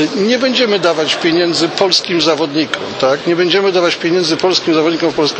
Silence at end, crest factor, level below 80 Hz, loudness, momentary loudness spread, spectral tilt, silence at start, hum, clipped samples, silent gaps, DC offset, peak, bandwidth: 0 s; 14 dB; -58 dBFS; -13 LUFS; 4 LU; -4 dB/octave; 0 s; none; under 0.1%; none; under 0.1%; 0 dBFS; 8.8 kHz